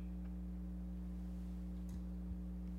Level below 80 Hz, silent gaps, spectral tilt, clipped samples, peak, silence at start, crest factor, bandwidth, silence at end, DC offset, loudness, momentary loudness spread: -48 dBFS; none; -9 dB/octave; under 0.1%; -36 dBFS; 0 s; 10 dB; 8.6 kHz; 0 s; under 0.1%; -48 LUFS; 0 LU